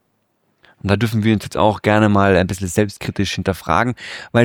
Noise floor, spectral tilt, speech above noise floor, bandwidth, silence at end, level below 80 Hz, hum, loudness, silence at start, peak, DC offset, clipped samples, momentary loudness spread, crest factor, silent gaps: -66 dBFS; -6 dB/octave; 49 dB; 17.5 kHz; 0 s; -44 dBFS; none; -17 LUFS; 0.85 s; -2 dBFS; under 0.1%; under 0.1%; 8 LU; 16 dB; none